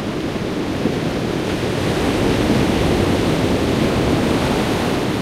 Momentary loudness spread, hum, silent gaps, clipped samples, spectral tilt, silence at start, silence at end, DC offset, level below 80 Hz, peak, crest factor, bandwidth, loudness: 5 LU; none; none; under 0.1%; -6 dB/octave; 0 s; 0 s; under 0.1%; -32 dBFS; -2 dBFS; 16 dB; 16 kHz; -18 LUFS